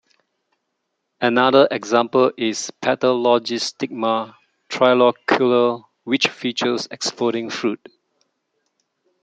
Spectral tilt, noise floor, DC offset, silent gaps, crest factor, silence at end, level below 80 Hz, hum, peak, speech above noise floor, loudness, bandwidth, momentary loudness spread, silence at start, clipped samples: -4 dB/octave; -75 dBFS; under 0.1%; none; 18 dB; 1.5 s; -70 dBFS; none; -2 dBFS; 57 dB; -19 LUFS; 9.2 kHz; 10 LU; 1.2 s; under 0.1%